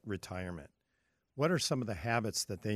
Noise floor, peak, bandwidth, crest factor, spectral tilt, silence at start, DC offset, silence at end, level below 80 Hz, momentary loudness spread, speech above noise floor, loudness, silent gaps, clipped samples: -80 dBFS; -16 dBFS; 15 kHz; 20 dB; -4.5 dB/octave; 0.05 s; under 0.1%; 0 s; -62 dBFS; 13 LU; 45 dB; -35 LUFS; none; under 0.1%